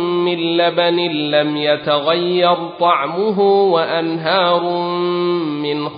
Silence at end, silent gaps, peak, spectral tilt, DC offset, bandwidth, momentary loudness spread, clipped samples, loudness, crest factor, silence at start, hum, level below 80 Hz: 0 s; none; -2 dBFS; -10.5 dB/octave; under 0.1%; 5.2 kHz; 5 LU; under 0.1%; -16 LUFS; 14 dB; 0 s; none; -66 dBFS